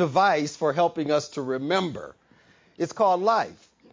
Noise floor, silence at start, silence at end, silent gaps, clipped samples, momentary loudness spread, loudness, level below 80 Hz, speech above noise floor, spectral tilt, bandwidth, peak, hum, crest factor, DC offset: -58 dBFS; 0 s; 0.4 s; none; under 0.1%; 12 LU; -25 LUFS; -68 dBFS; 34 dB; -5 dB/octave; 7.6 kHz; -10 dBFS; none; 16 dB; under 0.1%